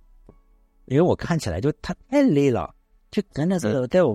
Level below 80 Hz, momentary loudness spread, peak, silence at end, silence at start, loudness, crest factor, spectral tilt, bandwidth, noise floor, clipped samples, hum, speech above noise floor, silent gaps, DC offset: -46 dBFS; 10 LU; -6 dBFS; 0 s; 0.9 s; -23 LUFS; 16 dB; -7 dB/octave; 13.5 kHz; -57 dBFS; under 0.1%; none; 36 dB; none; under 0.1%